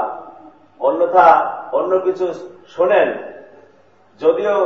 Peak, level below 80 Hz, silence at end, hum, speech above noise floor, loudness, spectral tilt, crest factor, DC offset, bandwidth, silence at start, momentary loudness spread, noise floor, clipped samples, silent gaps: 0 dBFS; -66 dBFS; 0 s; none; 37 dB; -16 LUFS; -6 dB/octave; 18 dB; 0.2%; 7 kHz; 0 s; 21 LU; -52 dBFS; under 0.1%; none